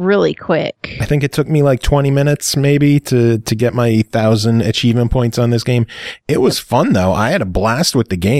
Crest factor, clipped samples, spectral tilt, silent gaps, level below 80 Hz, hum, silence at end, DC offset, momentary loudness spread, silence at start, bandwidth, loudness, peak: 12 dB; under 0.1%; -6 dB/octave; none; -32 dBFS; none; 0 s; under 0.1%; 5 LU; 0 s; 16 kHz; -14 LUFS; 0 dBFS